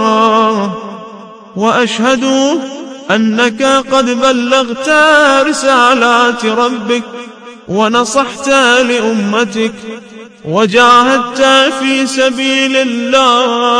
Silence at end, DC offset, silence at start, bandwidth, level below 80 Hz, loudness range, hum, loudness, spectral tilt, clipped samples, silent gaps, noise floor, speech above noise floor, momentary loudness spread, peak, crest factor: 0 s; under 0.1%; 0 s; 11 kHz; -52 dBFS; 3 LU; none; -10 LUFS; -3 dB/octave; 0.5%; none; -31 dBFS; 21 dB; 17 LU; 0 dBFS; 10 dB